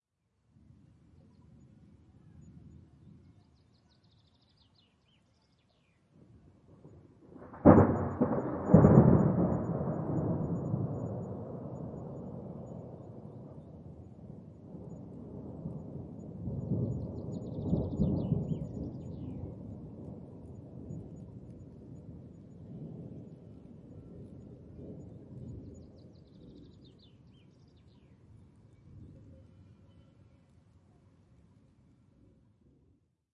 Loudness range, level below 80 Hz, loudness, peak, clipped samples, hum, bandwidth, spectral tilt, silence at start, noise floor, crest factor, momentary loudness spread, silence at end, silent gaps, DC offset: 24 LU; -54 dBFS; -30 LUFS; -4 dBFS; under 0.1%; none; 7.2 kHz; -11.5 dB/octave; 2.35 s; -76 dBFS; 30 dB; 26 LU; 3.7 s; none; under 0.1%